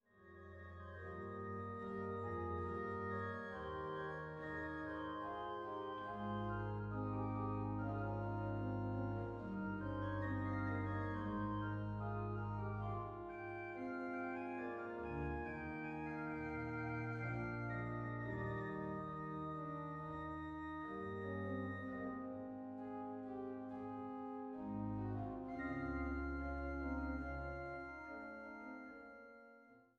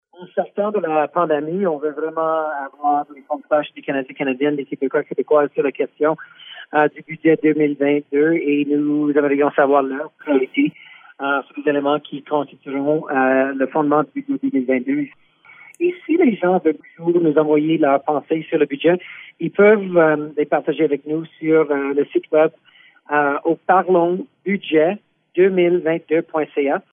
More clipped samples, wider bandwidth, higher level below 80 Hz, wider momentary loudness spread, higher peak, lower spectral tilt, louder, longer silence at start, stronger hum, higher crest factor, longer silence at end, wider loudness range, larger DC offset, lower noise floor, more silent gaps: neither; first, 6.6 kHz vs 3.7 kHz; first, -58 dBFS vs -72 dBFS; about the same, 7 LU vs 8 LU; second, -30 dBFS vs -2 dBFS; about the same, -9.5 dB/octave vs -9 dB/octave; second, -45 LUFS vs -19 LUFS; about the same, 0.15 s vs 0.2 s; neither; about the same, 14 dB vs 16 dB; about the same, 0.15 s vs 0.1 s; about the same, 4 LU vs 4 LU; neither; first, -65 dBFS vs -46 dBFS; neither